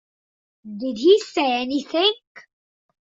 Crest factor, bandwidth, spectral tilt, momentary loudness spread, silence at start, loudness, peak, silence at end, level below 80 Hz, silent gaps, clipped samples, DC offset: 18 dB; 7.8 kHz; -3.5 dB/octave; 15 LU; 0.65 s; -20 LUFS; -4 dBFS; 0.75 s; -68 dBFS; 2.27-2.35 s; under 0.1%; under 0.1%